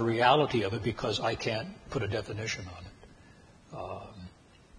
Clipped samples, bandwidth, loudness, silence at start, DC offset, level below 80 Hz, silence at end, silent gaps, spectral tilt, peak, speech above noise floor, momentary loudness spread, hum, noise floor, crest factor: under 0.1%; 10.5 kHz; -31 LUFS; 0 s; under 0.1%; -56 dBFS; 0 s; none; -5 dB/octave; -8 dBFS; 26 dB; 24 LU; none; -56 dBFS; 24 dB